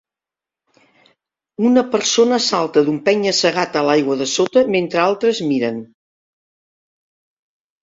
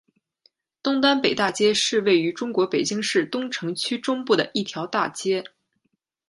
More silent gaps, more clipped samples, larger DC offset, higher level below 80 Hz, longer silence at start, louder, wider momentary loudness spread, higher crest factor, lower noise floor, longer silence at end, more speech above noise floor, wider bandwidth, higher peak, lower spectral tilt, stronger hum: neither; neither; neither; first, -62 dBFS vs -68 dBFS; first, 1.6 s vs 0.85 s; first, -16 LUFS vs -23 LUFS; second, 5 LU vs 8 LU; about the same, 16 dB vs 18 dB; first, -88 dBFS vs -74 dBFS; first, 1.95 s vs 0.8 s; first, 72 dB vs 52 dB; second, 7.8 kHz vs 11.5 kHz; about the same, -2 dBFS vs -4 dBFS; about the same, -3.5 dB/octave vs -3.5 dB/octave; neither